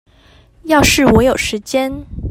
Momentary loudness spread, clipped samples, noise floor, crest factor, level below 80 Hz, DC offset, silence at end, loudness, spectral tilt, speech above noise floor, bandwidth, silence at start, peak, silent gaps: 14 LU; under 0.1%; -47 dBFS; 14 dB; -30 dBFS; under 0.1%; 0 s; -13 LUFS; -4 dB/octave; 34 dB; 16.5 kHz; 0.65 s; 0 dBFS; none